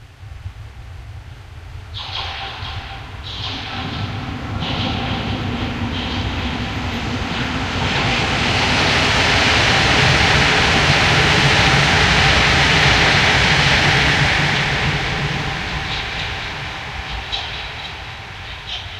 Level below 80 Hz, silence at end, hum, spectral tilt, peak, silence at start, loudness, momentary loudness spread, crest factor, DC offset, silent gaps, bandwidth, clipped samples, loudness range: -30 dBFS; 0 s; none; -3.5 dB/octave; 0 dBFS; 0 s; -16 LUFS; 18 LU; 18 dB; under 0.1%; none; 15 kHz; under 0.1%; 14 LU